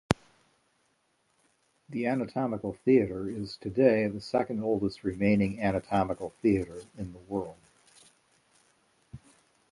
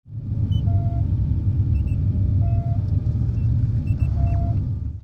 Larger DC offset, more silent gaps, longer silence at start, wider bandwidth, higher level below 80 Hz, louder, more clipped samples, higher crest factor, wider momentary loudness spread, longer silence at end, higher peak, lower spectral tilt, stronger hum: neither; neither; about the same, 0.1 s vs 0.05 s; first, 11.5 kHz vs 3.2 kHz; second, -56 dBFS vs -26 dBFS; second, -29 LUFS vs -22 LUFS; neither; first, 26 dB vs 12 dB; first, 12 LU vs 3 LU; first, 0.55 s vs 0.05 s; first, -6 dBFS vs -10 dBFS; second, -7 dB/octave vs -11 dB/octave; neither